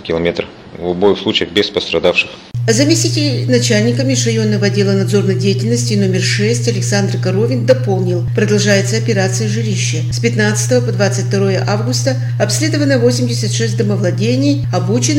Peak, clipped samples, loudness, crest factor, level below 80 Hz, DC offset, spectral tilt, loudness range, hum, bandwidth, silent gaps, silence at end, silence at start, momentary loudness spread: 0 dBFS; under 0.1%; -14 LUFS; 14 dB; -46 dBFS; under 0.1%; -5 dB/octave; 1 LU; none; 13.5 kHz; none; 0 s; 0 s; 4 LU